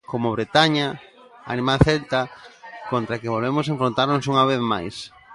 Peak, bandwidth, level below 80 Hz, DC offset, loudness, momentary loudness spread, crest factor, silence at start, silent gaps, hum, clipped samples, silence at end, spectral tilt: -2 dBFS; 11.5 kHz; -42 dBFS; under 0.1%; -21 LUFS; 16 LU; 20 dB; 0.1 s; none; none; under 0.1%; 0 s; -6 dB/octave